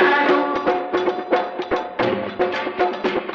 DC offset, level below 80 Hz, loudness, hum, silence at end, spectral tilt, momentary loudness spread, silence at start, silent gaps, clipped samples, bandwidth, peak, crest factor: under 0.1%; -56 dBFS; -21 LUFS; none; 0 s; -6 dB/octave; 6 LU; 0 s; none; under 0.1%; 6.8 kHz; -4 dBFS; 16 dB